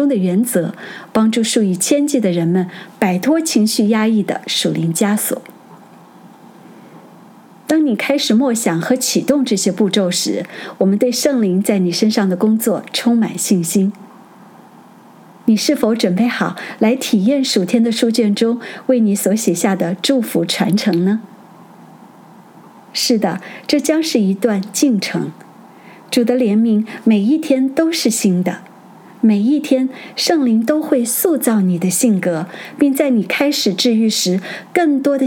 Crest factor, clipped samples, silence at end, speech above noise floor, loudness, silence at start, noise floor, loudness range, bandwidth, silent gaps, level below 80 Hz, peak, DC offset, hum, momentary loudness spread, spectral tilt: 16 dB; under 0.1%; 0 s; 27 dB; -16 LUFS; 0 s; -42 dBFS; 4 LU; 18 kHz; none; -66 dBFS; 0 dBFS; under 0.1%; none; 6 LU; -4.5 dB/octave